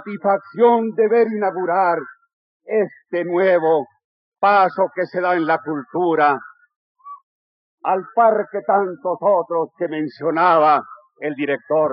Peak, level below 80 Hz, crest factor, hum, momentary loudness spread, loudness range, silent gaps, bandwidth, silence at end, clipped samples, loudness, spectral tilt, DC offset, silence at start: -4 dBFS; under -90 dBFS; 16 dB; none; 9 LU; 3 LU; 2.33-2.60 s, 4.04-4.32 s, 6.76-6.95 s, 7.23-7.78 s; 5.6 kHz; 0 s; under 0.1%; -18 LUFS; -4.5 dB/octave; under 0.1%; 0 s